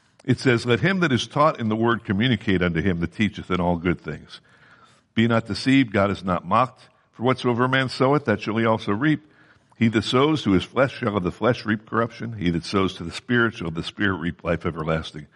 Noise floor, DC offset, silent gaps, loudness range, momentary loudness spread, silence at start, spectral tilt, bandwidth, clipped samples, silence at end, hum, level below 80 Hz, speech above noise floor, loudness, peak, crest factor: -54 dBFS; under 0.1%; none; 3 LU; 7 LU; 0.25 s; -6.5 dB/octave; 11 kHz; under 0.1%; 0.1 s; none; -50 dBFS; 32 dB; -22 LUFS; -6 dBFS; 18 dB